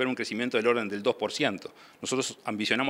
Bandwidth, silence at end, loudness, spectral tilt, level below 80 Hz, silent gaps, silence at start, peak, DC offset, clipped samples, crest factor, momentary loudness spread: 16 kHz; 0 s; -29 LUFS; -3.5 dB/octave; -78 dBFS; none; 0 s; -8 dBFS; under 0.1%; under 0.1%; 20 dB; 10 LU